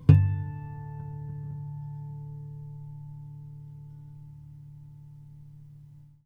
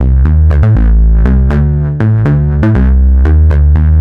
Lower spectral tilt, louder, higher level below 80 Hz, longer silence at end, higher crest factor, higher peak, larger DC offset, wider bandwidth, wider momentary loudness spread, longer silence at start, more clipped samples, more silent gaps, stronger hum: about the same, -10.5 dB/octave vs -11 dB/octave; second, -32 LUFS vs -9 LUFS; second, -50 dBFS vs -8 dBFS; first, 0.2 s vs 0 s; first, 28 dB vs 6 dB; about the same, -2 dBFS vs 0 dBFS; neither; first, 5 kHz vs 3.3 kHz; first, 16 LU vs 3 LU; about the same, 0 s vs 0 s; neither; neither; neither